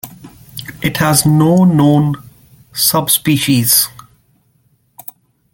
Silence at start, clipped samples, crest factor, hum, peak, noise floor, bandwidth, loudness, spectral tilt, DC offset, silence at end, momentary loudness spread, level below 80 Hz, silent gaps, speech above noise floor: 0.05 s; under 0.1%; 14 dB; none; 0 dBFS; -57 dBFS; 17 kHz; -12 LUFS; -4.5 dB/octave; under 0.1%; 1.65 s; 23 LU; -48 dBFS; none; 46 dB